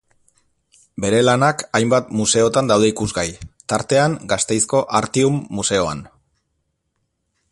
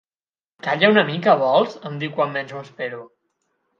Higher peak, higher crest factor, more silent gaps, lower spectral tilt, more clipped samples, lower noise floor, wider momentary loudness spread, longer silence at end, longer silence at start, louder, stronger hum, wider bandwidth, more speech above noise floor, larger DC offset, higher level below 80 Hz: about the same, -2 dBFS vs 0 dBFS; about the same, 18 dB vs 20 dB; neither; second, -4 dB/octave vs -6.5 dB/octave; neither; second, -72 dBFS vs under -90 dBFS; second, 9 LU vs 15 LU; first, 1.45 s vs 0.75 s; first, 1 s vs 0.65 s; about the same, -18 LUFS vs -20 LUFS; neither; first, 11.5 kHz vs 7.2 kHz; second, 54 dB vs over 70 dB; neither; first, -48 dBFS vs -72 dBFS